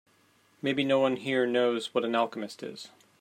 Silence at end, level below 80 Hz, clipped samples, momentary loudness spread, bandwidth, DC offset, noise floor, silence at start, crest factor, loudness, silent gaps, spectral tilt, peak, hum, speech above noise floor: 0.35 s; -78 dBFS; under 0.1%; 15 LU; 13.5 kHz; under 0.1%; -65 dBFS; 0.65 s; 18 dB; -28 LUFS; none; -5 dB/octave; -12 dBFS; none; 37 dB